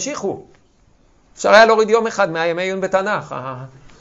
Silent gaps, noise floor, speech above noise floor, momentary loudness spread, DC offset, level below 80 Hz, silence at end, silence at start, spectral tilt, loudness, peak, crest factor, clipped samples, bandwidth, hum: none; -54 dBFS; 37 dB; 18 LU; under 0.1%; -56 dBFS; 0.35 s; 0 s; -3.5 dB/octave; -16 LUFS; 0 dBFS; 18 dB; under 0.1%; 8.4 kHz; none